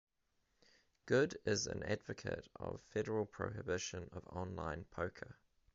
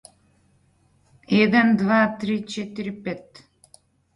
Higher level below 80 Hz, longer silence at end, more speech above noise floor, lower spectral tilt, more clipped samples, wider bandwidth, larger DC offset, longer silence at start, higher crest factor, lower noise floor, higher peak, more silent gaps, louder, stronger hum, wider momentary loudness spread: about the same, -60 dBFS vs -62 dBFS; second, 0.45 s vs 0.95 s; about the same, 41 dB vs 41 dB; second, -4.5 dB/octave vs -6.5 dB/octave; neither; second, 7.6 kHz vs 11 kHz; neither; second, 1.05 s vs 1.3 s; about the same, 22 dB vs 18 dB; first, -82 dBFS vs -62 dBFS; second, -20 dBFS vs -6 dBFS; neither; second, -41 LUFS vs -21 LUFS; neither; about the same, 13 LU vs 15 LU